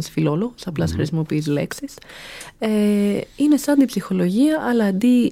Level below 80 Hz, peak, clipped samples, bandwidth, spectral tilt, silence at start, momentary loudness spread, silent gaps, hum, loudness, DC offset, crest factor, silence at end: -48 dBFS; -6 dBFS; under 0.1%; 16 kHz; -6.5 dB/octave; 0 s; 16 LU; none; none; -20 LUFS; under 0.1%; 14 dB; 0 s